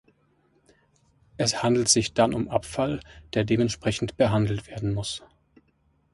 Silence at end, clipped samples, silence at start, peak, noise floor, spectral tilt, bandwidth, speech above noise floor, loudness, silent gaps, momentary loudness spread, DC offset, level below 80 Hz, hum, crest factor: 0.95 s; under 0.1%; 1.4 s; -6 dBFS; -67 dBFS; -4.5 dB/octave; 11.5 kHz; 42 dB; -25 LUFS; none; 10 LU; under 0.1%; -50 dBFS; none; 20 dB